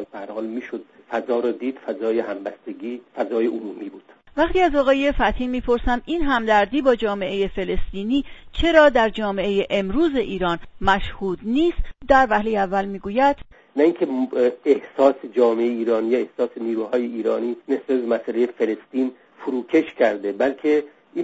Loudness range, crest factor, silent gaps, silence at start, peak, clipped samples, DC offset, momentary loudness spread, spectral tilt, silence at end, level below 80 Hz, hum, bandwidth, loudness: 4 LU; 20 dB; none; 0 s; 0 dBFS; under 0.1%; under 0.1%; 13 LU; -6.5 dB/octave; 0 s; -36 dBFS; none; 7.8 kHz; -21 LUFS